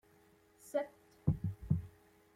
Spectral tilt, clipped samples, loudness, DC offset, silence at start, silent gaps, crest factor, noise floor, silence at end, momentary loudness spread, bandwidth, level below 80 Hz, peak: -8.5 dB/octave; under 0.1%; -39 LUFS; under 0.1%; 0.65 s; none; 22 dB; -67 dBFS; 0.45 s; 15 LU; 15.5 kHz; -56 dBFS; -18 dBFS